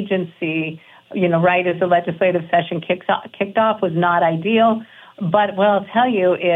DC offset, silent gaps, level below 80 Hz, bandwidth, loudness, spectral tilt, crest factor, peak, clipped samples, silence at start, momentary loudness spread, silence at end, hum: under 0.1%; none; -68 dBFS; 4 kHz; -18 LUFS; -8.5 dB/octave; 14 dB; -4 dBFS; under 0.1%; 0 s; 7 LU; 0 s; none